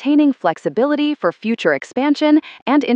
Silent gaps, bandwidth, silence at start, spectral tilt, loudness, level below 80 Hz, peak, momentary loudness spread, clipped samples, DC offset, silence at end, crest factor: 2.62-2.66 s; 8 kHz; 0 s; -5.5 dB/octave; -17 LUFS; -76 dBFS; -2 dBFS; 5 LU; under 0.1%; under 0.1%; 0 s; 14 dB